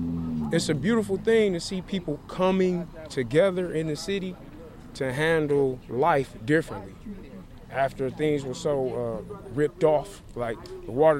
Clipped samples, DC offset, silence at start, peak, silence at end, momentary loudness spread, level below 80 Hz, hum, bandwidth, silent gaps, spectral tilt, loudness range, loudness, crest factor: under 0.1%; under 0.1%; 0 s; -8 dBFS; 0 s; 16 LU; -48 dBFS; none; 15.5 kHz; none; -6 dB/octave; 3 LU; -26 LUFS; 18 dB